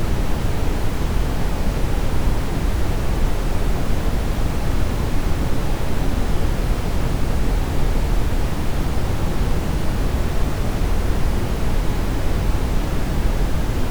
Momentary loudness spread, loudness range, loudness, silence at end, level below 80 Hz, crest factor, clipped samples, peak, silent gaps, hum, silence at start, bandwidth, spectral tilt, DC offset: 1 LU; 0 LU; -23 LUFS; 0 s; -20 dBFS; 12 dB; under 0.1%; -6 dBFS; none; none; 0 s; over 20 kHz; -6 dB/octave; under 0.1%